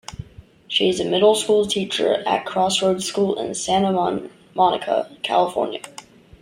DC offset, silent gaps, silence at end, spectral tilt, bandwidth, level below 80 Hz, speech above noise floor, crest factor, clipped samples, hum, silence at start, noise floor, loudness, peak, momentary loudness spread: under 0.1%; none; 0.4 s; -4 dB/octave; 16 kHz; -54 dBFS; 25 dB; 16 dB; under 0.1%; none; 0.1 s; -44 dBFS; -20 LUFS; -4 dBFS; 11 LU